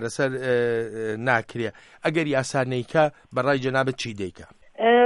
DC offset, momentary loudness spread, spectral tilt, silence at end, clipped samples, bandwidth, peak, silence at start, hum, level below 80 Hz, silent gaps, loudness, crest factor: under 0.1%; 9 LU; -5.5 dB/octave; 0 s; under 0.1%; 11.5 kHz; -6 dBFS; 0 s; none; -62 dBFS; none; -24 LUFS; 18 dB